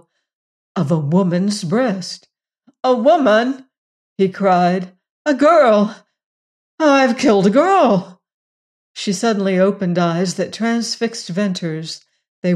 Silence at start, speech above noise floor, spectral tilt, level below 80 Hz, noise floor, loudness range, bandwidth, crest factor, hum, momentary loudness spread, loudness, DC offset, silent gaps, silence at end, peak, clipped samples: 0.75 s; 43 dB; -6 dB/octave; -66 dBFS; -58 dBFS; 4 LU; 12 kHz; 14 dB; none; 13 LU; -16 LUFS; under 0.1%; 3.78-4.16 s, 5.09-5.25 s, 6.26-6.78 s, 8.34-8.95 s, 12.28-12.42 s; 0 s; -4 dBFS; under 0.1%